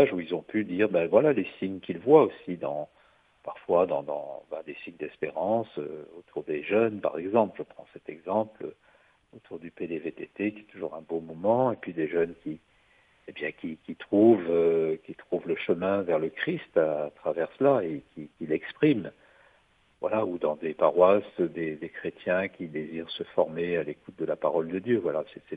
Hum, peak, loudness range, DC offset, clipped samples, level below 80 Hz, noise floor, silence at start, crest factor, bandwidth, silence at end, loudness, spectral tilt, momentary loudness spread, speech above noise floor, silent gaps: none; -6 dBFS; 6 LU; under 0.1%; under 0.1%; -70 dBFS; -65 dBFS; 0 s; 22 dB; 4.8 kHz; 0 s; -28 LUFS; -9 dB/octave; 17 LU; 37 dB; none